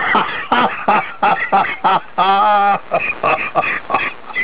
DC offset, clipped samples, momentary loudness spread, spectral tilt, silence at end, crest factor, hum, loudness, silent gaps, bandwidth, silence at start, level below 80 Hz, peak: 2%; under 0.1%; 5 LU; -7.5 dB/octave; 0 s; 12 dB; none; -15 LUFS; none; 4 kHz; 0 s; -54 dBFS; -4 dBFS